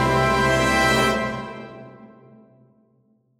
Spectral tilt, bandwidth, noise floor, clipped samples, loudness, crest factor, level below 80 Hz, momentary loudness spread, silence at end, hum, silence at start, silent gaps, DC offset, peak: -4.5 dB/octave; 16 kHz; -63 dBFS; under 0.1%; -19 LUFS; 16 dB; -40 dBFS; 21 LU; 1.35 s; none; 0 s; none; under 0.1%; -8 dBFS